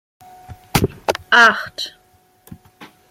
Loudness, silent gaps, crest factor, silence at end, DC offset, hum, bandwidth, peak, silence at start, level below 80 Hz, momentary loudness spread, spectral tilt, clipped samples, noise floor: -16 LUFS; none; 20 dB; 0.25 s; under 0.1%; none; 16.5 kHz; 0 dBFS; 0.5 s; -42 dBFS; 17 LU; -3.5 dB/octave; under 0.1%; -52 dBFS